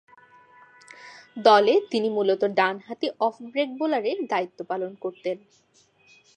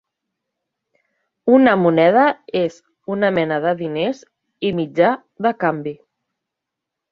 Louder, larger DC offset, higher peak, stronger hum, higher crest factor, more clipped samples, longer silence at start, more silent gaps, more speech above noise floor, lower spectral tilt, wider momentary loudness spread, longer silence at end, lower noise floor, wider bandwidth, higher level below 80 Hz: second, -24 LUFS vs -18 LUFS; neither; about the same, -4 dBFS vs -2 dBFS; neither; about the same, 22 dB vs 18 dB; neither; second, 1 s vs 1.45 s; neither; second, 34 dB vs 66 dB; second, -5 dB/octave vs -7.5 dB/octave; first, 16 LU vs 13 LU; second, 1 s vs 1.15 s; second, -58 dBFS vs -82 dBFS; first, 9.6 kHz vs 7.2 kHz; second, -82 dBFS vs -62 dBFS